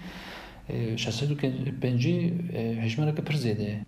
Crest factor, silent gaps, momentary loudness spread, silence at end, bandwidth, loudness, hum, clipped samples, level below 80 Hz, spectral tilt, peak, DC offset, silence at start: 16 dB; none; 13 LU; 0.05 s; 14.5 kHz; -29 LUFS; none; under 0.1%; -54 dBFS; -6.5 dB/octave; -14 dBFS; under 0.1%; 0 s